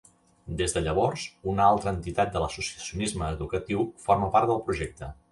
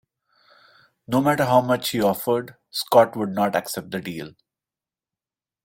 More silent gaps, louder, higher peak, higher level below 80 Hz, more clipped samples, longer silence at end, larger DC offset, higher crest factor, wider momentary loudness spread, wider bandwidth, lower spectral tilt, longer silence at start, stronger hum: neither; second, -27 LUFS vs -22 LUFS; second, -8 dBFS vs -2 dBFS; first, -44 dBFS vs -62 dBFS; neither; second, 0.2 s vs 1.35 s; neither; about the same, 20 dB vs 22 dB; second, 10 LU vs 13 LU; second, 11.5 kHz vs 16.5 kHz; about the same, -5 dB/octave vs -5 dB/octave; second, 0.45 s vs 1.1 s; neither